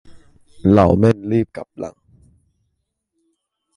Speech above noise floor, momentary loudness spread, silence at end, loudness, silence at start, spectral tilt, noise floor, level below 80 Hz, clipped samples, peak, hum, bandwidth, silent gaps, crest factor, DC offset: 58 dB; 19 LU; 1.85 s; -16 LUFS; 0.1 s; -9 dB/octave; -73 dBFS; -38 dBFS; under 0.1%; -2 dBFS; none; 11 kHz; none; 18 dB; under 0.1%